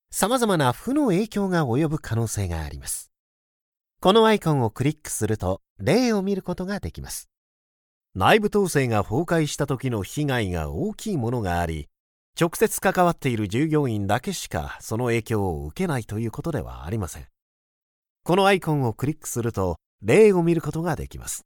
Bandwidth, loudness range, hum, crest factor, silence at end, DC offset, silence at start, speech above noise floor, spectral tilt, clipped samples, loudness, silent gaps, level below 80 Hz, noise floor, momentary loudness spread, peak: 19 kHz; 5 LU; none; 20 dB; 0.05 s; under 0.1%; 0.1 s; over 67 dB; -5.5 dB/octave; under 0.1%; -23 LUFS; 3.20-3.72 s, 5.70-5.76 s, 7.37-8.01 s, 12.00-12.33 s, 17.42-18.02 s, 18.10-18.16 s, 19.86-19.98 s; -44 dBFS; under -90 dBFS; 12 LU; -2 dBFS